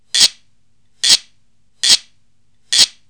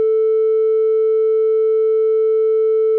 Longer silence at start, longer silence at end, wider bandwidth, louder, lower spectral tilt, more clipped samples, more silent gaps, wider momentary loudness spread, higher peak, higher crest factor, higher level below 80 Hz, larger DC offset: first, 0.15 s vs 0 s; first, 0.2 s vs 0 s; first, 11 kHz vs 3.2 kHz; first, -12 LUFS vs -15 LUFS; second, 3 dB/octave vs -5.5 dB/octave; neither; neither; first, 5 LU vs 0 LU; first, 0 dBFS vs -12 dBFS; first, 18 dB vs 2 dB; first, -66 dBFS vs under -90 dBFS; first, 0.4% vs under 0.1%